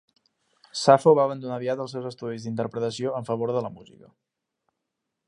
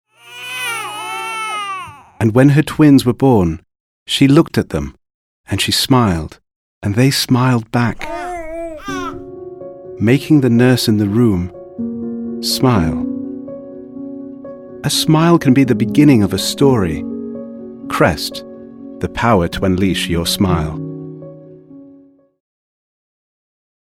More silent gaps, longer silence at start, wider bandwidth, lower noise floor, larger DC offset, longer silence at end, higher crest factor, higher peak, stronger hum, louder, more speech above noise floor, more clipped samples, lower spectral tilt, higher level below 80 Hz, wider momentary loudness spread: second, none vs 3.80-4.06 s, 5.14-5.44 s, 6.56-6.81 s; first, 0.75 s vs 0.25 s; second, 11 kHz vs 16.5 kHz; first, -82 dBFS vs -46 dBFS; neither; second, 1.45 s vs 2 s; first, 24 dB vs 16 dB; about the same, -2 dBFS vs 0 dBFS; neither; second, -24 LUFS vs -15 LUFS; first, 58 dB vs 33 dB; neither; about the same, -5.5 dB/octave vs -5.5 dB/octave; second, -72 dBFS vs -40 dBFS; second, 16 LU vs 20 LU